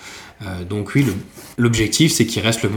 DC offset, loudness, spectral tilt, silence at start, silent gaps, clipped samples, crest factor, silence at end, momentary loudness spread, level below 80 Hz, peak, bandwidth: under 0.1%; -18 LUFS; -4.5 dB/octave; 0 s; none; under 0.1%; 18 dB; 0 s; 17 LU; -44 dBFS; -2 dBFS; 19 kHz